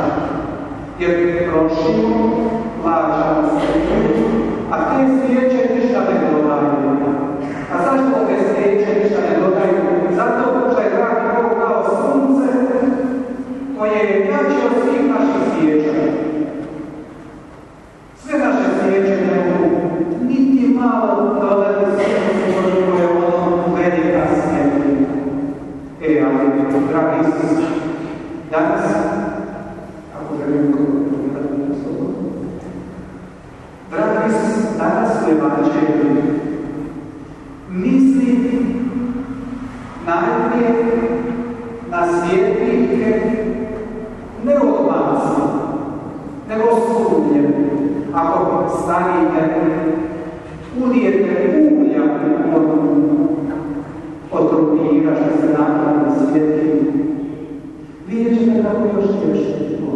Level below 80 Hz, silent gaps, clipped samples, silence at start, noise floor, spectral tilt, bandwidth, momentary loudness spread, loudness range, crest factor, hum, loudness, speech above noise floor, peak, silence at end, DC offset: -44 dBFS; none; under 0.1%; 0 s; -40 dBFS; -8 dB/octave; 10.5 kHz; 13 LU; 4 LU; 14 dB; none; -16 LUFS; 25 dB; -4 dBFS; 0 s; under 0.1%